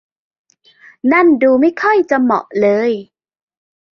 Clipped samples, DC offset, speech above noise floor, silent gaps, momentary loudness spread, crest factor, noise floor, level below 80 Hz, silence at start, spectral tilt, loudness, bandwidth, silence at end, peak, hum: under 0.1%; under 0.1%; 34 dB; none; 8 LU; 14 dB; -46 dBFS; -62 dBFS; 1.05 s; -7 dB/octave; -13 LUFS; 6.8 kHz; 0.95 s; -2 dBFS; none